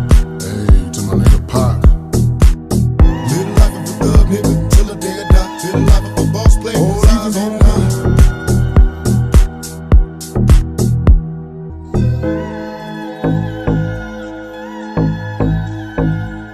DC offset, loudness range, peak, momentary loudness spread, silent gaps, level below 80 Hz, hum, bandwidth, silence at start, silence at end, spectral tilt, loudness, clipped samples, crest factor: under 0.1%; 6 LU; 0 dBFS; 12 LU; none; -14 dBFS; none; 14 kHz; 0 s; 0 s; -6.5 dB/octave; -14 LUFS; 0.5%; 12 dB